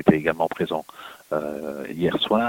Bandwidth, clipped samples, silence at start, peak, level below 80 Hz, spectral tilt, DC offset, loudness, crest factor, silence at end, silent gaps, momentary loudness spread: 17 kHz; under 0.1%; 0 s; -2 dBFS; -54 dBFS; -6.5 dB/octave; under 0.1%; -25 LUFS; 22 dB; 0 s; none; 11 LU